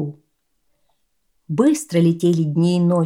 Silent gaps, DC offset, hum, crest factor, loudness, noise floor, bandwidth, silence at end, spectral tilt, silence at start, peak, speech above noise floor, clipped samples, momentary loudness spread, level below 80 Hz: none; under 0.1%; none; 14 dB; -18 LUFS; -70 dBFS; 14.5 kHz; 0 s; -7.5 dB/octave; 0 s; -4 dBFS; 54 dB; under 0.1%; 6 LU; -66 dBFS